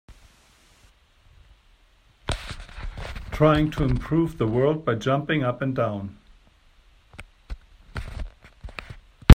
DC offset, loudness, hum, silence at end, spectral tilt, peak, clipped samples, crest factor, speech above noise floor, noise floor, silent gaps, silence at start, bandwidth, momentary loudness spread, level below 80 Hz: under 0.1%; -25 LUFS; none; 0 s; -7.5 dB/octave; 0 dBFS; under 0.1%; 24 dB; 35 dB; -58 dBFS; none; 0.1 s; 15 kHz; 22 LU; -32 dBFS